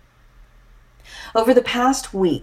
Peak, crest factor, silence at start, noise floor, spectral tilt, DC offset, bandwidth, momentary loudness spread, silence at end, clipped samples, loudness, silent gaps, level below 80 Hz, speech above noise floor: -2 dBFS; 20 dB; 1.1 s; -50 dBFS; -4.5 dB/octave; under 0.1%; 15.5 kHz; 19 LU; 0 s; under 0.1%; -18 LUFS; none; -46 dBFS; 32 dB